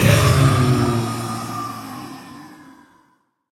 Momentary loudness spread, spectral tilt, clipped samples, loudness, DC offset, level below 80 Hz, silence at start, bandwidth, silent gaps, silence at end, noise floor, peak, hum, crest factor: 23 LU; -5.5 dB/octave; under 0.1%; -18 LUFS; under 0.1%; -38 dBFS; 0 s; 17 kHz; none; 0.95 s; -62 dBFS; 0 dBFS; none; 20 dB